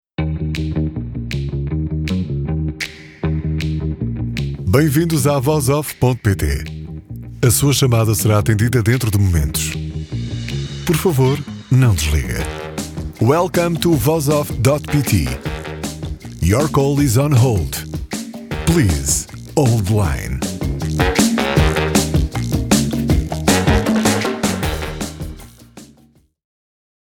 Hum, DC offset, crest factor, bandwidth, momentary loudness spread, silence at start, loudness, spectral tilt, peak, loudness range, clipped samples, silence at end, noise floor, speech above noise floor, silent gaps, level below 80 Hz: none; under 0.1%; 18 dB; 19 kHz; 12 LU; 0.2 s; -18 LUFS; -5.5 dB/octave; 0 dBFS; 4 LU; under 0.1%; 1.2 s; -52 dBFS; 37 dB; none; -28 dBFS